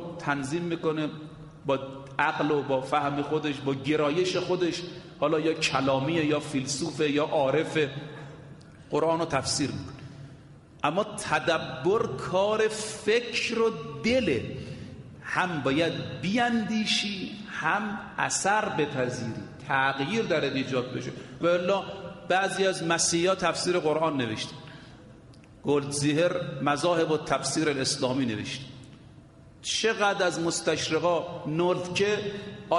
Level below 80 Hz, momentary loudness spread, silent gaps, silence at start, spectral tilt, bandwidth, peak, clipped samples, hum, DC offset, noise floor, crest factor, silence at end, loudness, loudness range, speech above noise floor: -60 dBFS; 13 LU; none; 0 s; -4 dB/octave; 11.5 kHz; -8 dBFS; under 0.1%; none; under 0.1%; -51 dBFS; 20 dB; 0 s; -27 LUFS; 2 LU; 24 dB